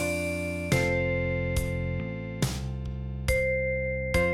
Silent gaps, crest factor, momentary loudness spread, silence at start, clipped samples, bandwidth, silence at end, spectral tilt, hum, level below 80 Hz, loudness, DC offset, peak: none; 16 dB; 8 LU; 0 s; under 0.1%; 16 kHz; 0 s; -5.5 dB/octave; none; -38 dBFS; -29 LUFS; under 0.1%; -12 dBFS